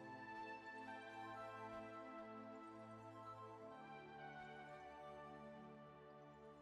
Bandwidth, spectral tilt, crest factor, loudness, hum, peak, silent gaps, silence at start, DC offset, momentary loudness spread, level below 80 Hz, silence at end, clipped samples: 12 kHz; -6 dB/octave; 12 dB; -56 LUFS; none; -44 dBFS; none; 0 s; under 0.1%; 7 LU; -82 dBFS; 0 s; under 0.1%